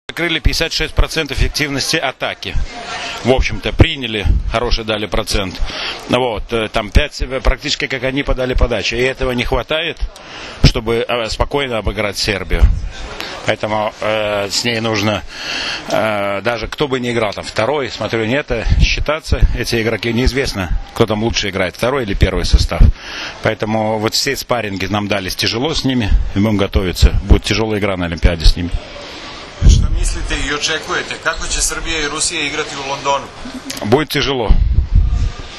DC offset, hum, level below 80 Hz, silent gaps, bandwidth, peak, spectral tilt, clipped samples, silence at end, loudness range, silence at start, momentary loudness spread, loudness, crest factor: under 0.1%; none; -20 dBFS; none; 13.5 kHz; 0 dBFS; -4.5 dB/octave; 0.3%; 0 s; 2 LU; 0.1 s; 7 LU; -17 LUFS; 16 dB